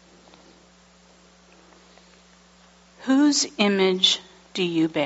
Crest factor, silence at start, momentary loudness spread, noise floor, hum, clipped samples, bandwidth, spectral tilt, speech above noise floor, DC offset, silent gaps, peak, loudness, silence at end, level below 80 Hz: 20 dB; 3 s; 10 LU; -54 dBFS; none; under 0.1%; 8 kHz; -3 dB/octave; 34 dB; under 0.1%; none; -6 dBFS; -21 LUFS; 0 s; -66 dBFS